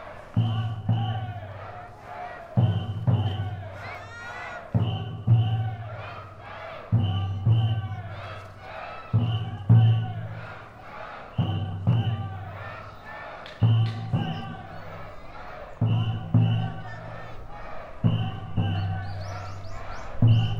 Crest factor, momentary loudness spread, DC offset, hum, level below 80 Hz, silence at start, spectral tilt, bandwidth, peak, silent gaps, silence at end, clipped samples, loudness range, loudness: 18 dB; 18 LU; under 0.1%; none; -48 dBFS; 0 s; -8.5 dB/octave; 6 kHz; -8 dBFS; none; 0 s; under 0.1%; 4 LU; -27 LUFS